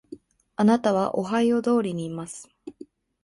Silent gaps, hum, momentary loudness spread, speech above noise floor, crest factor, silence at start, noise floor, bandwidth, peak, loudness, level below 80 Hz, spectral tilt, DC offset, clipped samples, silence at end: none; none; 21 LU; 26 dB; 18 dB; 0.1 s; -48 dBFS; 11.5 kHz; -8 dBFS; -23 LUFS; -66 dBFS; -6.5 dB/octave; under 0.1%; under 0.1%; 0.4 s